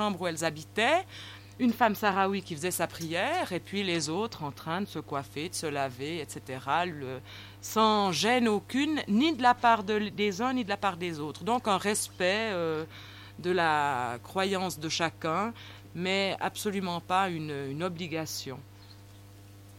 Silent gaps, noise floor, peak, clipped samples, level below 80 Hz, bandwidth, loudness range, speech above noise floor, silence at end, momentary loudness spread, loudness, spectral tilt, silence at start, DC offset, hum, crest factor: none; -51 dBFS; -8 dBFS; under 0.1%; -64 dBFS; 16.5 kHz; 7 LU; 21 dB; 0 s; 12 LU; -29 LUFS; -4 dB/octave; 0 s; under 0.1%; 50 Hz at -50 dBFS; 22 dB